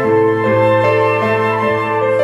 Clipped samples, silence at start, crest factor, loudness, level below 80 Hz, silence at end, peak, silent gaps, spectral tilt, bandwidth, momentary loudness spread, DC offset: under 0.1%; 0 s; 10 dB; -14 LUFS; -54 dBFS; 0 s; -4 dBFS; none; -7.5 dB/octave; 12 kHz; 3 LU; under 0.1%